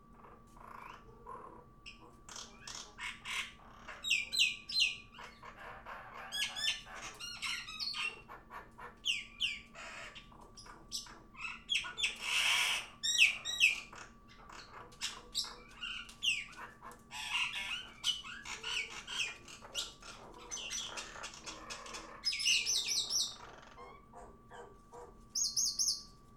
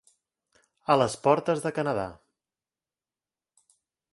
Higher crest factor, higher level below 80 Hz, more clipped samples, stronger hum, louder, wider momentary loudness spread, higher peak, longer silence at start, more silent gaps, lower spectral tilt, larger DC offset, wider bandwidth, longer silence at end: about the same, 26 dB vs 24 dB; about the same, -64 dBFS vs -64 dBFS; neither; neither; second, -35 LUFS vs -26 LUFS; first, 24 LU vs 12 LU; second, -12 dBFS vs -6 dBFS; second, 0 s vs 0.9 s; neither; second, 1.5 dB/octave vs -5.5 dB/octave; neither; first, 18.5 kHz vs 11.5 kHz; second, 0 s vs 2 s